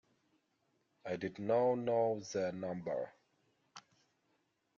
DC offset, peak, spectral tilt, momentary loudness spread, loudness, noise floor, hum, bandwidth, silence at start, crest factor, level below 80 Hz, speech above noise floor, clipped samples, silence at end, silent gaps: under 0.1%; -22 dBFS; -6 dB/octave; 11 LU; -37 LUFS; -80 dBFS; none; 7.4 kHz; 1.05 s; 18 dB; -80 dBFS; 44 dB; under 0.1%; 1 s; none